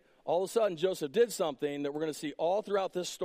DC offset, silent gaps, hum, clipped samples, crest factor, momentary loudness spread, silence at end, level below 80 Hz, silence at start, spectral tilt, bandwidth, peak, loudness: under 0.1%; none; none; under 0.1%; 16 dB; 6 LU; 0 s; -78 dBFS; 0.25 s; -4 dB/octave; 15.5 kHz; -16 dBFS; -32 LUFS